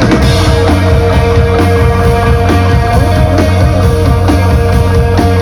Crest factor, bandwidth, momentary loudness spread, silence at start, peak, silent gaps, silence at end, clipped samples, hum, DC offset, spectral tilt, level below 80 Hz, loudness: 8 dB; 13.5 kHz; 1 LU; 0 s; 0 dBFS; none; 0 s; under 0.1%; none; under 0.1%; -7 dB/octave; -14 dBFS; -9 LUFS